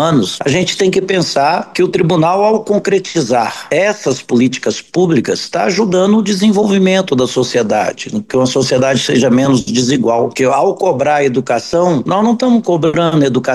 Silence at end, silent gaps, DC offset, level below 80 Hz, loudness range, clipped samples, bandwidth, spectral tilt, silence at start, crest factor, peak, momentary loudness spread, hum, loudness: 0 s; none; 0.1%; -50 dBFS; 1 LU; under 0.1%; 12.5 kHz; -5 dB/octave; 0 s; 10 dB; -2 dBFS; 4 LU; none; -13 LUFS